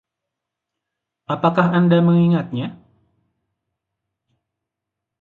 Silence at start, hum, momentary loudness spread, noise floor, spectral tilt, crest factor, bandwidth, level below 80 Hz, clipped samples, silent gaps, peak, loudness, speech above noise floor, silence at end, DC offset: 1.3 s; none; 13 LU; -83 dBFS; -10 dB/octave; 18 dB; 4.3 kHz; -62 dBFS; under 0.1%; none; -2 dBFS; -17 LUFS; 67 dB; 2.45 s; under 0.1%